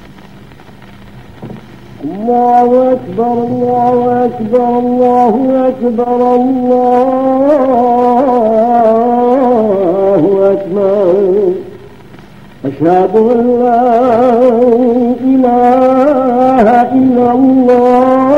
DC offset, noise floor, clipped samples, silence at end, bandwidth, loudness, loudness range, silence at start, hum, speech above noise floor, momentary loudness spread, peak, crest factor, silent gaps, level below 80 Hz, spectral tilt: 1%; -35 dBFS; under 0.1%; 0 s; 6.6 kHz; -9 LUFS; 4 LU; 0.05 s; none; 26 dB; 6 LU; 0 dBFS; 10 dB; none; -46 dBFS; -8.5 dB/octave